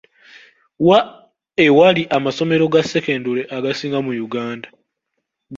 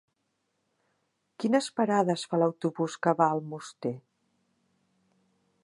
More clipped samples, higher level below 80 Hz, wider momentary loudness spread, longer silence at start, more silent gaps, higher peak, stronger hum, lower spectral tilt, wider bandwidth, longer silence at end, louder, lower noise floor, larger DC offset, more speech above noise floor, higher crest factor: neither; first, -58 dBFS vs -80 dBFS; about the same, 13 LU vs 11 LU; second, 0.8 s vs 1.4 s; neither; first, -2 dBFS vs -10 dBFS; neither; about the same, -6 dB/octave vs -6 dB/octave; second, 7.6 kHz vs 11.5 kHz; second, 0 s vs 1.65 s; first, -17 LUFS vs -28 LUFS; about the same, -76 dBFS vs -78 dBFS; neither; first, 60 dB vs 51 dB; second, 16 dB vs 22 dB